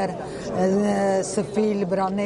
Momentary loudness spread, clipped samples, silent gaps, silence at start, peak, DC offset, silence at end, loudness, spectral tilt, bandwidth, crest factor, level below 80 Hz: 7 LU; under 0.1%; none; 0 s; -10 dBFS; under 0.1%; 0 s; -23 LUFS; -6 dB/octave; 11.5 kHz; 14 dB; -52 dBFS